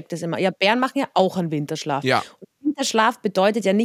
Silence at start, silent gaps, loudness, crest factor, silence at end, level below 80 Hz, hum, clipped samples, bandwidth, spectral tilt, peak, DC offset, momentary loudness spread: 0.1 s; none; -21 LUFS; 18 dB; 0 s; -78 dBFS; none; under 0.1%; 16 kHz; -4.5 dB/octave; -2 dBFS; under 0.1%; 8 LU